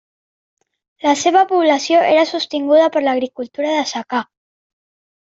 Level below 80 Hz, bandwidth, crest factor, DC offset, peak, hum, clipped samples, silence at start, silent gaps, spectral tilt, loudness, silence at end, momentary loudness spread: -66 dBFS; 8 kHz; 14 dB; under 0.1%; -2 dBFS; none; under 0.1%; 1.05 s; none; -2.5 dB/octave; -16 LUFS; 1 s; 10 LU